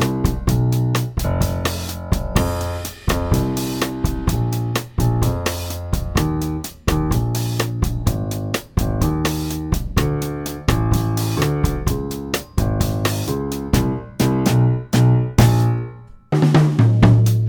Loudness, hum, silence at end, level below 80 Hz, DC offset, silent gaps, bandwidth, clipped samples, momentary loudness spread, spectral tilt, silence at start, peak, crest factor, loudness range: -20 LUFS; none; 0 s; -28 dBFS; under 0.1%; none; over 20 kHz; under 0.1%; 9 LU; -6 dB/octave; 0 s; -2 dBFS; 18 dB; 4 LU